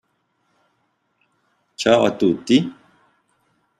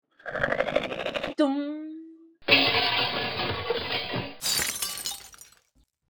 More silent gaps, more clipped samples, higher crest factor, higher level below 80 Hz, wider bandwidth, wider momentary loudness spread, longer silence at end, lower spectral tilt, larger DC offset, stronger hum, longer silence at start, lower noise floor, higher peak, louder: neither; neither; about the same, 20 dB vs 24 dB; second, -62 dBFS vs -56 dBFS; second, 11 kHz vs over 20 kHz; second, 13 LU vs 16 LU; first, 1.05 s vs 0.6 s; first, -5.5 dB/octave vs -2.5 dB/octave; neither; neither; first, 1.8 s vs 0.2 s; about the same, -69 dBFS vs -67 dBFS; about the same, -2 dBFS vs -4 dBFS; first, -18 LUFS vs -26 LUFS